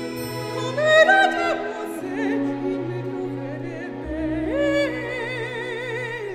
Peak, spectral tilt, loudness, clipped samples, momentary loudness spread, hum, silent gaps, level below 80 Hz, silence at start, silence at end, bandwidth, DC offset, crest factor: -4 dBFS; -5 dB/octave; -23 LUFS; under 0.1%; 15 LU; none; none; -48 dBFS; 0 s; 0 s; 15 kHz; under 0.1%; 20 dB